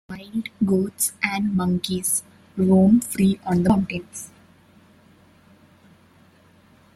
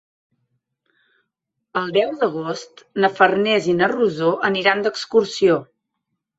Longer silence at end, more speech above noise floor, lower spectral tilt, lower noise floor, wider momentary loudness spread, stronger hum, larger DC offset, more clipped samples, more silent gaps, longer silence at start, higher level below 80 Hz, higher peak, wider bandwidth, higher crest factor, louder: first, 2.7 s vs 0.75 s; second, 34 dB vs 60 dB; about the same, -5.5 dB/octave vs -5 dB/octave; second, -54 dBFS vs -78 dBFS; first, 14 LU vs 11 LU; neither; neither; neither; neither; second, 0.1 s vs 1.75 s; first, -54 dBFS vs -64 dBFS; about the same, -4 dBFS vs -2 dBFS; first, 15 kHz vs 8 kHz; about the same, 18 dB vs 20 dB; about the same, -21 LUFS vs -19 LUFS